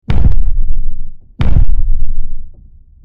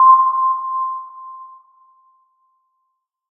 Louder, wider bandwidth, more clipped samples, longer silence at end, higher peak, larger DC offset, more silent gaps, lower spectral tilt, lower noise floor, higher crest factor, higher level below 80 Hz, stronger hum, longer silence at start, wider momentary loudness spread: second, -19 LUFS vs -16 LUFS; first, 3.7 kHz vs 1.6 kHz; neither; second, 0.5 s vs 1.85 s; about the same, 0 dBFS vs -2 dBFS; neither; neither; first, -9 dB/octave vs -1 dB/octave; second, -38 dBFS vs -73 dBFS; second, 8 dB vs 18 dB; first, -12 dBFS vs under -90 dBFS; neither; about the same, 0.1 s vs 0 s; second, 19 LU vs 24 LU